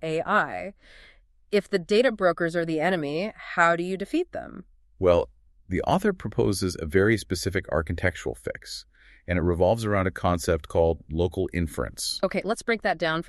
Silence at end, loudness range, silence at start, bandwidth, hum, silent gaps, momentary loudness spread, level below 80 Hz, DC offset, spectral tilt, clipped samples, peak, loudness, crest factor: 0.05 s; 2 LU; 0 s; 13 kHz; none; none; 11 LU; -44 dBFS; under 0.1%; -5.5 dB/octave; under 0.1%; -6 dBFS; -25 LUFS; 20 dB